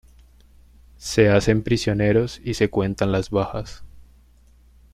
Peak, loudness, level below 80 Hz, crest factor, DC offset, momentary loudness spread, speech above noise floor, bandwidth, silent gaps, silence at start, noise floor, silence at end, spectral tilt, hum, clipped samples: -4 dBFS; -21 LUFS; -42 dBFS; 20 dB; under 0.1%; 12 LU; 32 dB; 14 kHz; none; 1 s; -53 dBFS; 0.95 s; -6 dB/octave; none; under 0.1%